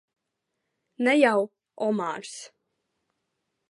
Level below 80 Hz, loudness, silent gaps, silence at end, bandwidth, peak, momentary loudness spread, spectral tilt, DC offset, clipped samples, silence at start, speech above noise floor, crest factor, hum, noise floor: -84 dBFS; -25 LUFS; none; 1.2 s; 11.5 kHz; -6 dBFS; 17 LU; -4.5 dB/octave; under 0.1%; under 0.1%; 1 s; 57 dB; 24 dB; none; -82 dBFS